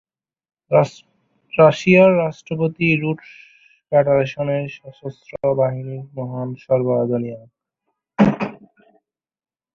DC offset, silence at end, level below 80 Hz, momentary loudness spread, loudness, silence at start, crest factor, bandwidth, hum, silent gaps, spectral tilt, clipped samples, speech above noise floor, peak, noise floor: under 0.1%; 1.2 s; -56 dBFS; 18 LU; -18 LUFS; 0.7 s; 18 dB; 7.4 kHz; none; none; -7.5 dB/octave; under 0.1%; 58 dB; -2 dBFS; -76 dBFS